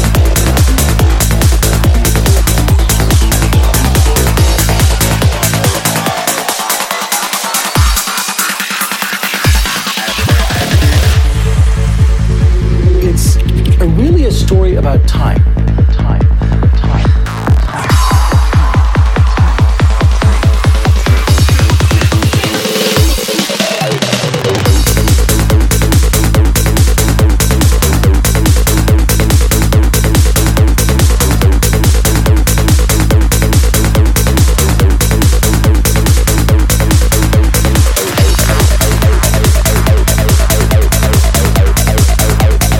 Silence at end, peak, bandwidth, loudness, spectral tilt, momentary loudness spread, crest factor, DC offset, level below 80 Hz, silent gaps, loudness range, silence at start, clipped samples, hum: 0 s; 0 dBFS; 17 kHz; -10 LUFS; -4.5 dB/octave; 3 LU; 8 dB; under 0.1%; -12 dBFS; none; 2 LU; 0 s; under 0.1%; none